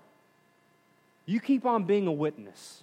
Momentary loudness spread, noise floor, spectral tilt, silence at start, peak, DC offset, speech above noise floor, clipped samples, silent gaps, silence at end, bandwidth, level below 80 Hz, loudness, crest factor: 20 LU; -65 dBFS; -7 dB/octave; 1.25 s; -14 dBFS; under 0.1%; 37 dB; under 0.1%; none; 0.1 s; 12 kHz; -90 dBFS; -28 LUFS; 16 dB